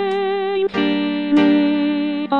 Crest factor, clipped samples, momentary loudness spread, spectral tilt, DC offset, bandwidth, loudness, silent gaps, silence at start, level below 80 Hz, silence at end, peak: 14 dB; under 0.1%; 6 LU; -7 dB/octave; 0.3%; 5.6 kHz; -18 LUFS; none; 0 s; -60 dBFS; 0 s; -4 dBFS